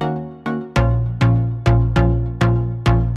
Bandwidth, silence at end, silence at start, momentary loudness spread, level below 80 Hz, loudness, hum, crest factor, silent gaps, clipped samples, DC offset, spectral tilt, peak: 8.2 kHz; 0 s; 0 s; 8 LU; -24 dBFS; -18 LUFS; none; 16 dB; none; under 0.1%; under 0.1%; -8 dB/octave; -2 dBFS